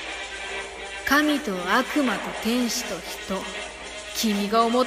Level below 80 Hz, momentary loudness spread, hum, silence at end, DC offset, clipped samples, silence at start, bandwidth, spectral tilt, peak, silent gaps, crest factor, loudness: -52 dBFS; 11 LU; none; 0 s; under 0.1%; under 0.1%; 0 s; 15.5 kHz; -3 dB/octave; -6 dBFS; none; 18 dB; -25 LUFS